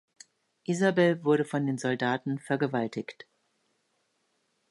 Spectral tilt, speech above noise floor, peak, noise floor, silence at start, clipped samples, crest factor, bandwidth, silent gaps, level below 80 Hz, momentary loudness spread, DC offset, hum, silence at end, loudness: -6 dB/octave; 47 dB; -12 dBFS; -75 dBFS; 0.7 s; under 0.1%; 18 dB; 11.5 kHz; none; -78 dBFS; 12 LU; under 0.1%; none; 1.6 s; -28 LUFS